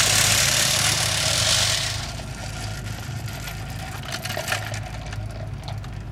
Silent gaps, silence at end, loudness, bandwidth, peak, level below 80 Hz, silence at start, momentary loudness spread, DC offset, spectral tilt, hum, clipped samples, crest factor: none; 0 s; -22 LUFS; 17.5 kHz; -4 dBFS; -40 dBFS; 0 s; 16 LU; under 0.1%; -1.5 dB/octave; none; under 0.1%; 20 dB